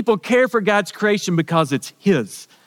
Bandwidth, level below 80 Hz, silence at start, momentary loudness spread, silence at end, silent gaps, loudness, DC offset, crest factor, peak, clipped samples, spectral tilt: 17.5 kHz; -68 dBFS; 0 s; 5 LU; 0.2 s; none; -18 LUFS; under 0.1%; 16 dB; -4 dBFS; under 0.1%; -5.5 dB/octave